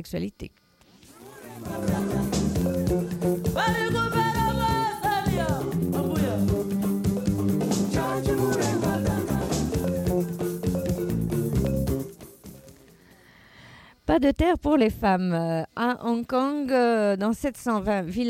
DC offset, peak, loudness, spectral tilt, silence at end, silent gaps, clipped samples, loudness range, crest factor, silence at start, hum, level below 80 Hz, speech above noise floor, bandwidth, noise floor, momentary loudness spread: under 0.1%; -8 dBFS; -25 LUFS; -6 dB/octave; 0 s; none; under 0.1%; 5 LU; 16 dB; 0 s; none; -40 dBFS; 30 dB; 16.5 kHz; -55 dBFS; 9 LU